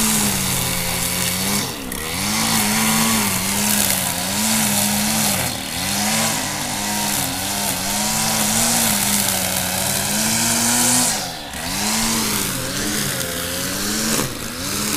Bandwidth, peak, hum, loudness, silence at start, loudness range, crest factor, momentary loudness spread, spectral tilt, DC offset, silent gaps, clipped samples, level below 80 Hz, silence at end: 16 kHz; 0 dBFS; none; -18 LUFS; 0 s; 3 LU; 20 dB; 6 LU; -2 dB/octave; under 0.1%; none; under 0.1%; -42 dBFS; 0 s